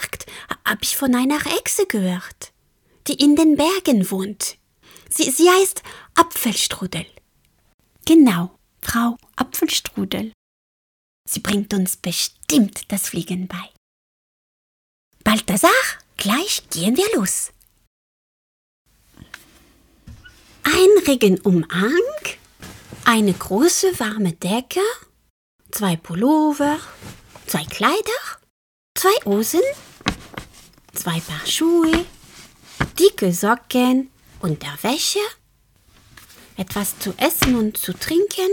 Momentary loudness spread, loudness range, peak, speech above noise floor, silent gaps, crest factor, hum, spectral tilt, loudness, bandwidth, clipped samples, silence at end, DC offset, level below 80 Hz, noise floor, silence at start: 16 LU; 5 LU; 0 dBFS; 42 dB; 7.74-7.79 s, 10.34-11.24 s, 13.77-15.11 s, 17.87-18.85 s, 25.30-25.59 s, 28.50-28.95 s; 20 dB; none; -4 dB/octave; -19 LUFS; over 20 kHz; under 0.1%; 0 s; under 0.1%; -48 dBFS; -61 dBFS; 0 s